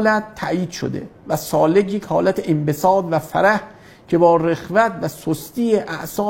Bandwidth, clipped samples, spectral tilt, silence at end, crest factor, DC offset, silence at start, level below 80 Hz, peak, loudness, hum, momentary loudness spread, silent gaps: 16.5 kHz; under 0.1%; -6 dB/octave; 0 s; 18 dB; under 0.1%; 0 s; -52 dBFS; -2 dBFS; -19 LUFS; none; 10 LU; none